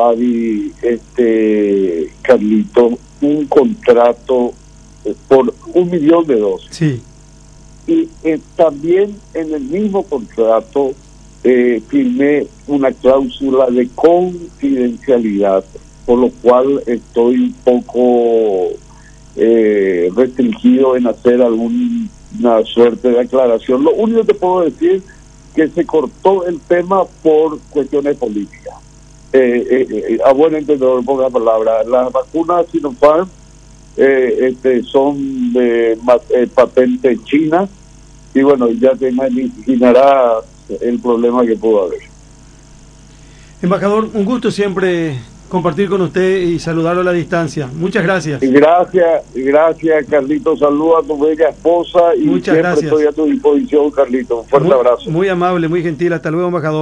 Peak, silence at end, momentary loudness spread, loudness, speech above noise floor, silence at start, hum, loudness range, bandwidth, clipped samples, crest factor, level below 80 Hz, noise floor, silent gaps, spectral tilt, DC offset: 0 dBFS; 0 s; 7 LU; -13 LUFS; 27 dB; 0 s; none; 3 LU; 10 kHz; 0.3%; 12 dB; -44 dBFS; -39 dBFS; none; -7 dB/octave; under 0.1%